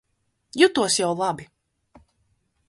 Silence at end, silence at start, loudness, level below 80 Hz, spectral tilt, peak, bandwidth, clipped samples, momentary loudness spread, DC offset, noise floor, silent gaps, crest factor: 1.25 s; 0.55 s; -21 LUFS; -64 dBFS; -3 dB/octave; -2 dBFS; 11.5 kHz; under 0.1%; 17 LU; under 0.1%; -72 dBFS; none; 22 dB